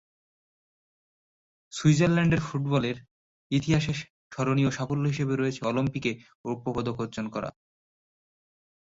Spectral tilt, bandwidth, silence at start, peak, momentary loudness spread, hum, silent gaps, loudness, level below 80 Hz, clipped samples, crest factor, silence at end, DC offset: -6.5 dB/octave; 8 kHz; 1.7 s; -10 dBFS; 13 LU; none; 3.11-3.50 s, 4.10-4.30 s, 6.35-6.44 s; -27 LUFS; -56 dBFS; under 0.1%; 20 dB; 1.3 s; under 0.1%